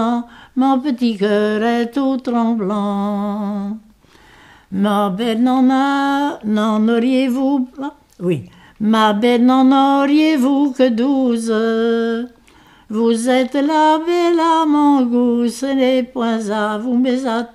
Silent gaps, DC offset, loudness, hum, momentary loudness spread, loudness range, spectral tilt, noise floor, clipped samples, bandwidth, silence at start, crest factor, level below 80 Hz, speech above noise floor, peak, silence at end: none; under 0.1%; -16 LUFS; none; 9 LU; 5 LU; -6 dB/octave; -48 dBFS; under 0.1%; 13.5 kHz; 0 s; 14 dB; -56 dBFS; 32 dB; -2 dBFS; 0.1 s